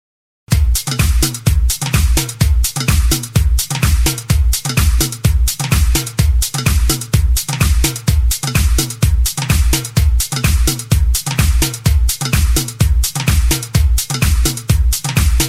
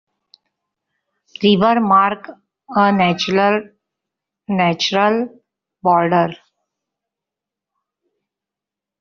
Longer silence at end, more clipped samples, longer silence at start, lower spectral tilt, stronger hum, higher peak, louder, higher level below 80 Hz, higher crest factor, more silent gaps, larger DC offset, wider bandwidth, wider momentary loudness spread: second, 0 s vs 2.65 s; neither; second, 0.5 s vs 1.4 s; about the same, -4 dB/octave vs -3.5 dB/octave; neither; about the same, 0 dBFS vs -2 dBFS; about the same, -15 LUFS vs -16 LUFS; first, -16 dBFS vs -60 dBFS; about the same, 14 dB vs 18 dB; neither; first, 0.3% vs under 0.1%; first, 16.5 kHz vs 7 kHz; second, 2 LU vs 9 LU